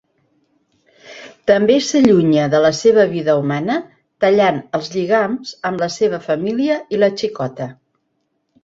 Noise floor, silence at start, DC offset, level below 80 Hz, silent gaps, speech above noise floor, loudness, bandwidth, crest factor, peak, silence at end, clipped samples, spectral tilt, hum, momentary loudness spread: -69 dBFS; 1.05 s; under 0.1%; -56 dBFS; none; 54 dB; -16 LUFS; 7.8 kHz; 16 dB; -2 dBFS; 0.9 s; under 0.1%; -5.5 dB/octave; none; 11 LU